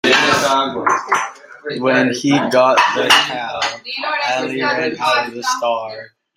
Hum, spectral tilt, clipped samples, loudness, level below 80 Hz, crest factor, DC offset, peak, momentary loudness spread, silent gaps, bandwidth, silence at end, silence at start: none; -3 dB/octave; under 0.1%; -16 LUFS; -60 dBFS; 16 dB; under 0.1%; 0 dBFS; 11 LU; none; 16 kHz; 0.3 s; 0.05 s